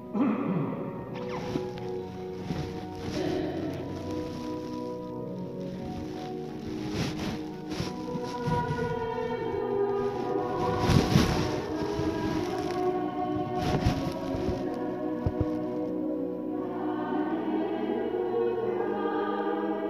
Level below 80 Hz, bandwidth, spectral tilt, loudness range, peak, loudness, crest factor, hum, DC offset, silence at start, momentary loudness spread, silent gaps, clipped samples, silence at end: -46 dBFS; 15.5 kHz; -7 dB/octave; 7 LU; -8 dBFS; -31 LUFS; 22 dB; none; under 0.1%; 0 s; 9 LU; none; under 0.1%; 0 s